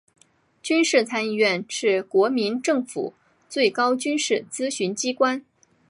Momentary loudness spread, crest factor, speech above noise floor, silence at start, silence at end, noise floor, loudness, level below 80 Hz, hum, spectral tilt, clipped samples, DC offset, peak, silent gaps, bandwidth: 11 LU; 18 dB; 27 dB; 0.65 s; 0.5 s; -49 dBFS; -23 LUFS; -78 dBFS; none; -3 dB/octave; under 0.1%; under 0.1%; -6 dBFS; none; 11.5 kHz